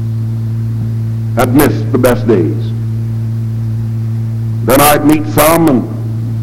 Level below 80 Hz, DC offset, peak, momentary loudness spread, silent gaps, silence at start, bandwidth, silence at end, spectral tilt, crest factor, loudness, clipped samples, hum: -34 dBFS; under 0.1%; 0 dBFS; 9 LU; none; 0 s; 17 kHz; 0 s; -6 dB/octave; 12 dB; -12 LUFS; 0.3%; none